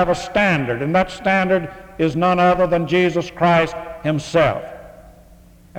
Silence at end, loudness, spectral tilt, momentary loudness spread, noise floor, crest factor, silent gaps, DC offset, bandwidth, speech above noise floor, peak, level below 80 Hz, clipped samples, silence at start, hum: 0 s; -18 LUFS; -6.5 dB/octave; 8 LU; -46 dBFS; 16 dB; none; under 0.1%; 13.5 kHz; 28 dB; -4 dBFS; -44 dBFS; under 0.1%; 0 s; none